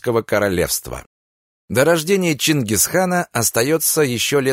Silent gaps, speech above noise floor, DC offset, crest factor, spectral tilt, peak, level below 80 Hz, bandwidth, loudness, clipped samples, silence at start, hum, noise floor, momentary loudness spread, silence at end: 1.06-1.68 s; over 73 dB; under 0.1%; 16 dB; -3.5 dB/octave; -2 dBFS; -46 dBFS; 16.5 kHz; -17 LUFS; under 0.1%; 0.05 s; none; under -90 dBFS; 6 LU; 0 s